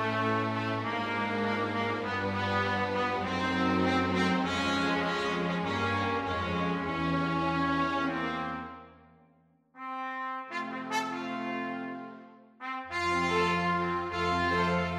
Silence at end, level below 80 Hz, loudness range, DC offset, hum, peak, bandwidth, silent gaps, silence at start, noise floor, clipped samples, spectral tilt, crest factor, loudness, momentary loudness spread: 0 s; -58 dBFS; 7 LU; under 0.1%; none; -14 dBFS; 13 kHz; none; 0 s; -65 dBFS; under 0.1%; -5.5 dB/octave; 16 dB; -30 LUFS; 10 LU